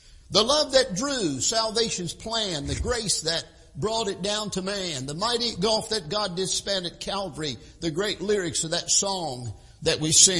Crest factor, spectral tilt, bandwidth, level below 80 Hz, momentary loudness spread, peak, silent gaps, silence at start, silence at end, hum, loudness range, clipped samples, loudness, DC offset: 24 dB; -2 dB/octave; 12 kHz; -46 dBFS; 10 LU; -2 dBFS; none; 0.1 s; 0 s; none; 3 LU; under 0.1%; -25 LUFS; under 0.1%